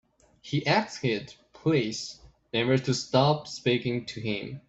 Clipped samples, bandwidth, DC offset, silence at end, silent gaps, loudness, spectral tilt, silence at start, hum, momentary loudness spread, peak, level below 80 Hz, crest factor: under 0.1%; 8.2 kHz; under 0.1%; 0.1 s; none; -28 LUFS; -5.5 dB/octave; 0.45 s; none; 9 LU; -8 dBFS; -62 dBFS; 20 dB